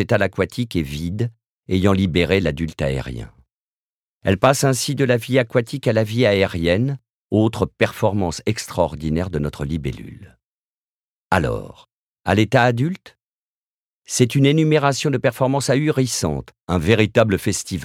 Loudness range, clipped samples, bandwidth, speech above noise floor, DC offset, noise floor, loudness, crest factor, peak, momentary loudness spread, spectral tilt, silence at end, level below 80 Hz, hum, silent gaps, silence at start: 6 LU; under 0.1%; 16.5 kHz; over 71 dB; under 0.1%; under -90 dBFS; -19 LUFS; 20 dB; 0 dBFS; 10 LU; -5.5 dB/octave; 0 s; -42 dBFS; none; 1.48-1.63 s, 3.53-4.21 s, 7.10-7.30 s, 10.45-11.30 s, 11.93-12.15 s, 13.24-14.02 s, 16.61-16.67 s; 0 s